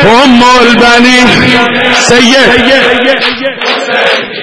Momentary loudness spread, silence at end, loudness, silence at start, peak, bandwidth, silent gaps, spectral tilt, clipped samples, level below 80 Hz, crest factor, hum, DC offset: 6 LU; 0 s; -4 LUFS; 0 s; 0 dBFS; 11 kHz; none; -3.5 dB/octave; 9%; -34 dBFS; 6 dB; none; under 0.1%